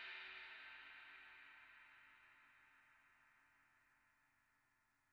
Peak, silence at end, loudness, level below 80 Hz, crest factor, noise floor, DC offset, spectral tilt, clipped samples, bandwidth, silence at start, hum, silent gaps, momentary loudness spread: -42 dBFS; 0 s; -58 LUFS; under -90 dBFS; 20 dB; -82 dBFS; under 0.1%; 3 dB/octave; under 0.1%; 7.2 kHz; 0 s; none; none; 15 LU